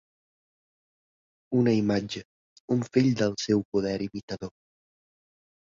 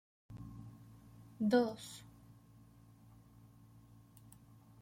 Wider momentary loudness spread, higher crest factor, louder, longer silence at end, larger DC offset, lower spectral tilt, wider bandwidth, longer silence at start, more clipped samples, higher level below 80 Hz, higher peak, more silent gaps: second, 14 LU vs 29 LU; about the same, 20 dB vs 24 dB; first, -27 LUFS vs -37 LUFS; second, 1.25 s vs 2.8 s; neither; about the same, -6.5 dB/octave vs -6 dB/octave; second, 7.6 kHz vs 16.5 kHz; first, 1.5 s vs 0.3 s; neither; first, -62 dBFS vs -70 dBFS; first, -10 dBFS vs -20 dBFS; first, 2.25-2.68 s, 3.65-3.72 s, 4.23-4.28 s vs none